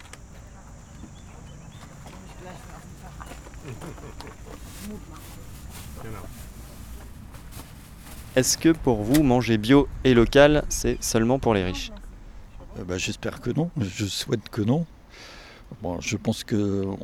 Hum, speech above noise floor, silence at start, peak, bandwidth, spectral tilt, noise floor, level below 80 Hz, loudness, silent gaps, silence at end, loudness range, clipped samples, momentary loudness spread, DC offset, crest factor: none; 21 dB; 0 s; -4 dBFS; 19.5 kHz; -5 dB/octave; -45 dBFS; -40 dBFS; -23 LUFS; none; 0 s; 21 LU; under 0.1%; 24 LU; under 0.1%; 22 dB